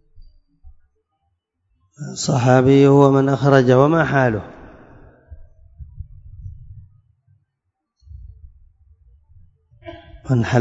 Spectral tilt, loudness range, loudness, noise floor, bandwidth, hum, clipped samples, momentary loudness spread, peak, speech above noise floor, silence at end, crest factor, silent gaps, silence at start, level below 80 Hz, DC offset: -7 dB/octave; 11 LU; -15 LUFS; -76 dBFS; 7.8 kHz; none; under 0.1%; 28 LU; 0 dBFS; 62 dB; 0 s; 20 dB; none; 2 s; -46 dBFS; under 0.1%